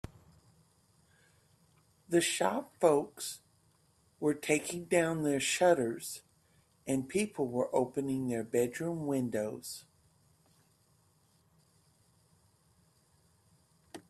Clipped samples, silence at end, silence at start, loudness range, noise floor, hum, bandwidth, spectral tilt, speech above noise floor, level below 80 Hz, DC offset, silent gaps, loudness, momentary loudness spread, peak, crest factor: under 0.1%; 0.1 s; 2.1 s; 8 LU; -70 dBFS; none; 14.5 kHz; -4.5 dB/octave; 38 dB; -70 dBFS; under 0.1%; none; -32 LUFS; 15 LU; -12 dBFS; 24 dB